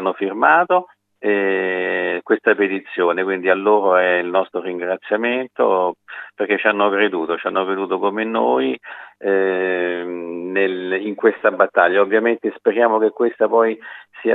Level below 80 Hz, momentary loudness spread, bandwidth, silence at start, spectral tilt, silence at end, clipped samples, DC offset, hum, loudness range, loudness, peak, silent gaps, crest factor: -86 dBFS; 10 LU; 4 kHz; 0 s; -7.5 dB/octave; 0 s; under 0.1%; under 0.1%; none; 3 LU; -18 LUFS; 0 dBFS; none; 18 dB